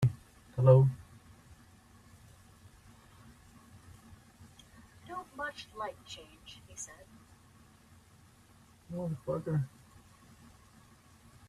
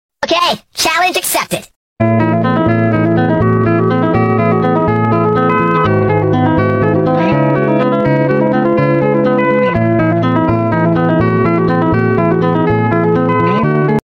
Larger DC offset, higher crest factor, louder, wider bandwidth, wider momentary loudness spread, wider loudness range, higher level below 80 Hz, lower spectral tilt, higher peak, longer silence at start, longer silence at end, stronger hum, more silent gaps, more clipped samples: neither; first, 26 dB vs 10 dB; second, -32 LUFS vs -12 LUFS; second, 11.5 kHz vs 16.5 kHz; first, 32 LU vs 1 LU; first, 25 LU vs 1 LU; second, -64 dBFS vs -40 dBFS; about the same, -7 dB/octave vs -6.5 dB/octave; second, -10 dBFS vs -2 dBFS; second, 0 s vs 0.2 s; first, 1.8 s vs 0.05 s; neither; second, none vs 1.76-1.96 s; neither